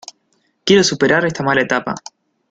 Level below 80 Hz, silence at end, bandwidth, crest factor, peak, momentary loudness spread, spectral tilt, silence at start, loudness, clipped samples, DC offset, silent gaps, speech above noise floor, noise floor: -54 dBFS; 0.5 s; 9.2 kHz; 16 dB; -2 dBFS; 13 LU; -4 dB/octave; 0.65 s; -15 LUFS; under 0.1%; under 0.1%; none; 49 dB; -64 dBFS